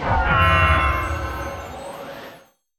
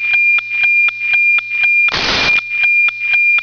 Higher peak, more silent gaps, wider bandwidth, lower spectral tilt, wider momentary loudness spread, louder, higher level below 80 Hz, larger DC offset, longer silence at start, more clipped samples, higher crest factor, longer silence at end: about the same, -4 dBFS vs -4 dBFS; neither; first, 17 kHz vs 5.4 kHz; first, -5.5 dB/octave vs -1.5 dB/octave; first, 19 LU vs 2 LU; second, -19 LUFS vs -10 LUFS; first, -30 dBFS vs -44 dBFS; neither; about the same, 0 s vs 0 s; neither; first, 18 dB vs 8 dB; first, 0.4 s vs 0 s